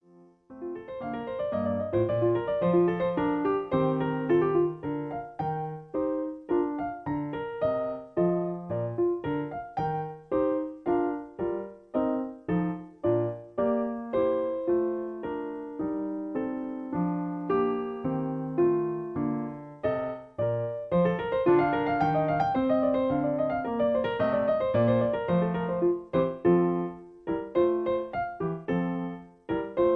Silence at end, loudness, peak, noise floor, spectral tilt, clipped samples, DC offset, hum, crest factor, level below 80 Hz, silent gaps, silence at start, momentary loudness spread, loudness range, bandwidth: 0 s; -29 LUFS; -12 dBFS; -57 dBFS; -10 dB/octave; under 0.1%; under 0.1%; none; 16 dB; -58 dBFS; none; 0.5 s; 9 LU; 5 LU; 5.2 kHz